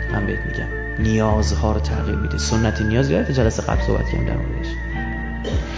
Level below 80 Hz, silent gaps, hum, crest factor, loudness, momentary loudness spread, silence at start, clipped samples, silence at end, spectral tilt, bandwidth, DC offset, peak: -24 dBFS; none; none; 16 dB; -21 LUFS; 8 LU; 0 s; under 0.1%; 0 s; -6 dB/octave; 7.8 kHz; under 0.1%; -4 dBFS